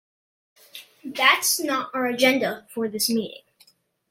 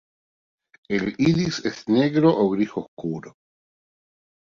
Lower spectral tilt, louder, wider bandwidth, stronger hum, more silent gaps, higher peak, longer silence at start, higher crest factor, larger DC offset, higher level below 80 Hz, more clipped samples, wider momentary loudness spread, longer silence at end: second, -1.5 dB/octave vs -6.5 dB/octave; about the same, -22 LUFS vs -22 LUFS; first, 16.5 kHz vs 7.6 kHz; neither; second, none vs 2.88-2.97 s; about the same, -4 dBFS vs -6 dBFS; second, 0.75 s vs 0.9 s; about the same, 22 dB vs 18 dB; neither; second, -74 dBFS vs -58 dBFS; neither; first, 22 LU vs 13 LU; second, 0.75 s vs 1.25 s